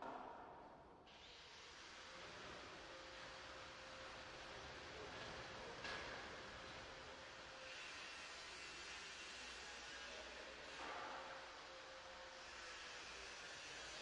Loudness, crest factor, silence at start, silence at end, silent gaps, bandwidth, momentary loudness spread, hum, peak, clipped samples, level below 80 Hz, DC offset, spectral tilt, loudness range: -54 LUFS; 18 dB; 0 s; 0 s; none; 11 kHz; 6 LU; none; -36 dBFS; under 0.1%; -74 dBFS; under 0.1%; -2 dB/octave; 3 LU